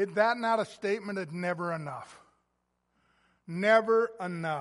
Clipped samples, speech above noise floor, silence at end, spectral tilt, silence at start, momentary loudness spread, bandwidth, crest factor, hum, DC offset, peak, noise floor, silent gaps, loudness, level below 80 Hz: under 0.1%; 49 dB; 0 s; -6 dB/octave; 0 s; 13 LU; 11.5 kHz; 20 dB; 60 Hz at -60 dBFS; under 0.1%; -10 dBFS; -78 dBFS; none; -29 LUFS; -78 dBFS